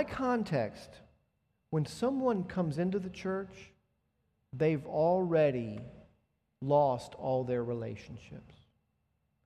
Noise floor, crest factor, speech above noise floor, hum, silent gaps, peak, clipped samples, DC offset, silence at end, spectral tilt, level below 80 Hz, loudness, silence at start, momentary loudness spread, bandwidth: -78 dBFS; 18 dB; 46 dB; none; none; -16 dBFS; under 0.1%; under 0.1%; 0.95 s; -7.5 dB/octave; -64 dBFS; -32 LUFS; 0 s; 20 LU; 13 kHz